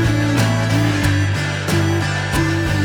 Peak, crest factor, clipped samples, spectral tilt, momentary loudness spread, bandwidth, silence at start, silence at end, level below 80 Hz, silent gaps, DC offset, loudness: -4 dBFS; 14 dB; under 0.1%; -5.5 dB/octave; 3 LU; over 20 kHz; 0 s; 0 s; -34 dBFS; none; under 0.1%; -17 LUFS